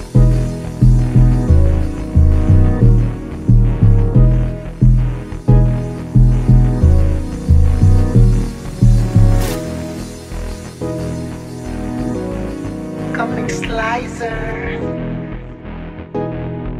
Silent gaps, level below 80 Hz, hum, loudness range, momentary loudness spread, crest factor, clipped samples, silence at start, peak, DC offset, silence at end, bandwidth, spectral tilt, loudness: none; -18 dBFS; none; 9 LU; 14 LU; 12 dB; under 0.1%; 0 s; 0 dBFS; under 0.1%; 0 s; 12.5 kHz; -8 dB/octave; -16 LUFS